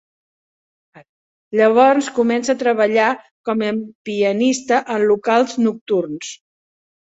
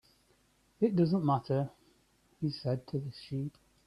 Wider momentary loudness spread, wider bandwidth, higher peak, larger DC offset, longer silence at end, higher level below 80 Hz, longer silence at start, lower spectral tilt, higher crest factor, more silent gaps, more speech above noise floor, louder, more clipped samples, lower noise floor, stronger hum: about the same, 12 LU vs 11 LU; second, 8.2 kHz vs 11.5 kHz; first, -2 dBFS vs -16 dBFS; neither; first, 0.65 s vs 0.4 s; about the same, -66 dBFS vs -68 dBFS; first, 0.95 s vs 0.8 s; second, -4.5 dB/octave vs -9 dB/octave; about the same, 16 dB vs 18 dB; first, 1.09-1.51 s, 3.31-3.44 s, 3.95-4.05 s, 5.81-5.86 s vs none; first, over 73 dB vs 38 dB; first, -17 LUFS vs -33 LUFS; neither; first, under -90 dBFS vs -69 dBFS; neither